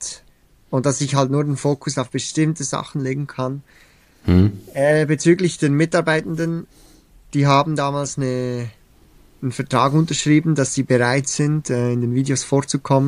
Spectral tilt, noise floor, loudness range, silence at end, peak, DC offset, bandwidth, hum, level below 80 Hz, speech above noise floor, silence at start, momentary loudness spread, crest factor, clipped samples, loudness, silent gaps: -5.5 dB/octave; -53 dBFS; 4 LU; 0 s; -2 dBFS; under 0.1%; 11.5 kHz; none; -48 dBFS; 35 dB; 0 s; 10 LU; 18 dB; under 0.1%; -19 LUFS; none